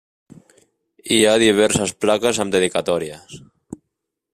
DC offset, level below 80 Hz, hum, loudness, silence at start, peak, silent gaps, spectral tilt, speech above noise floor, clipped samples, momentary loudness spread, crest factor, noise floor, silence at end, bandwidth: under 0.1%; -56 dBFS; none; -17 LUFS; 1.05 s; -2 dBFS; none; -3.5 dB/octave; 61 dB; under 0.1%; 21 LU; 18 dB; -79 dBFS; 0.95 s; 15 kHz